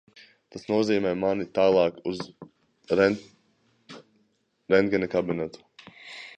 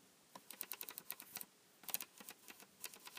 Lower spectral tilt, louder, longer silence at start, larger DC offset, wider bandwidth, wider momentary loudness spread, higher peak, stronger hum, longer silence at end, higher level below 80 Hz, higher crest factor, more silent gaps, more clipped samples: first, -6.5 dB/octave vs 0 dB/octave; first, -25 LUFS vs -49 LUFS; first, 0.55 s vs 0 s; neither; second, 8.8 kHz vs 16 kHz; first, 19 LU vs 13 LU; first, -6 dBFS vs -20 dBFS; neither; about the same, 0.05 s vs 0 s; first, -60 dBFS vs under -90 dBFS; second, 20 dB vs 34 dB; neither; neither